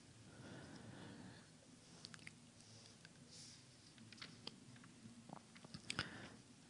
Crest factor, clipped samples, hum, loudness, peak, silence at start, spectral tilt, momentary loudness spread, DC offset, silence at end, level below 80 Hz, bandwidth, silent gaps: 34 dB; under 0.1%; none; -56 LUFS; -24 dBFS; 0 s; -3 dB/octave; 14 LU; under 0.1%; 0 s; -80 dBFS; 12 kHz; none